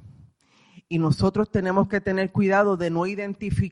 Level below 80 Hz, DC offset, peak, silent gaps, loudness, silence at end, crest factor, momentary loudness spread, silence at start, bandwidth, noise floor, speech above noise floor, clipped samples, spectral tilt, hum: -46 dBFS; under 0.1%; -8 dBFS; none; -23 LUFS; 0 s; 16 dB; 7 LU; 0.05 s; 11 kHz; -59 dBFS; 36 dB; under 0.1%; -7.5 dB/octave; none